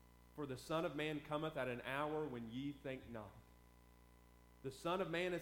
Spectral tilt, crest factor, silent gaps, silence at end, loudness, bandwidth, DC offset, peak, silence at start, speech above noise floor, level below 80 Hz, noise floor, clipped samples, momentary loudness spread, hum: -5.5 dB/octave; 18 dB; none; 0 s; -45 LUFS; 19 kHz; under 0.1%; -28 dBFS; 0 s; 22 dB; -68 dBFS; -66 dBFS; under 0.1%; 13 LU; 60 Hz at -65 dBFS